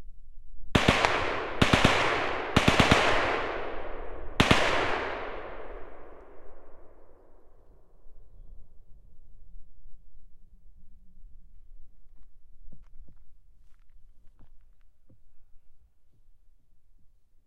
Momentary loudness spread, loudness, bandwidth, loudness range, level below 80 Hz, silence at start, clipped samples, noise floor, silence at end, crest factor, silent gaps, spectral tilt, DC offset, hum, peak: 21 LU; -25 LUFS; 15 kHz; 17 LU; -44 dBFS; 0 s; under 0.1%; -53 dBFS; 0.05 s; 30 dB; none; -4.5 dB/octave; under 0.1%; none; 0 dBFS